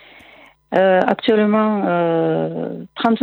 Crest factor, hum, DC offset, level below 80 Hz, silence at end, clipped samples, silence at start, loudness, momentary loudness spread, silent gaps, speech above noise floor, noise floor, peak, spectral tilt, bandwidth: 16 dB; none; under 0.1%; -64 dBFS; 0 s; under 0.1%; 0.7 s; -17 LUFS; 8 LU; none; 30 dB; -47 dBFS; -2 dBFS; -8.5 dB/octave; 5.6 kHz